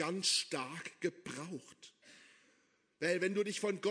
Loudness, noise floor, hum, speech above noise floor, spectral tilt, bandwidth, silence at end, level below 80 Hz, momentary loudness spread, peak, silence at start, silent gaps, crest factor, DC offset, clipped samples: -37 LUFS; -74 dBFS; none; 37 dB; -3 dB/octave; 11 kHz; 0 s; -88 dBFS; 20 LU; -20 dBFS; 0 s; none; 20 dB; under 0.1%; under 0.1%